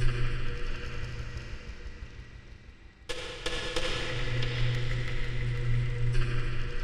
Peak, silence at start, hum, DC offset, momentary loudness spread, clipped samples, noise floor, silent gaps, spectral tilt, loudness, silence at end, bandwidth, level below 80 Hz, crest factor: -14 dBFS; 0 s; none; under 0.1%; 17 LU; under 0.1%; -50 dBFS; none; -5 dB/octave; -34 LUFS; 0 s; 10.5 kHz; -34 dBFS; 16 dB